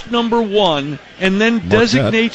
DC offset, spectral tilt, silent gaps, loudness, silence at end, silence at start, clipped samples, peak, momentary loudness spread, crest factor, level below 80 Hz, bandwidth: under 0.1%; -5.5 dB/octave; none; -14 LUFS; 0 s; 0 s; under 0.1%; -2 dBFS; 6 LU; 14 dB; -42 dBFS; 8.6 kHz